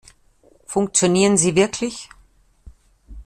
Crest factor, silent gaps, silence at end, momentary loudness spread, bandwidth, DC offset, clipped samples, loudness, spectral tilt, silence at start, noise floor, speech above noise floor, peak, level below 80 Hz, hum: 18 dB; none; 0.05 s; 12 LU; 14 kHz; under 0.1%; under 0.1%; -18 LUFS; -4 dB/octave; 0.7 s; -55 dBFS; 37 dB; -4 dBFS; -48 dBFS; none